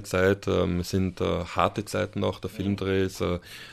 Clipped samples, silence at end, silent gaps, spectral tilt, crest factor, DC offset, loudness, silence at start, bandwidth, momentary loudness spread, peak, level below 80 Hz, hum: under 0.1%; 0 s; none; -6 dB/octave; 20 dB; under 0.1%; -27 LUFS; 0 s; 14 kHz; 6 LU; -6 dBFS; -50 dBFS; none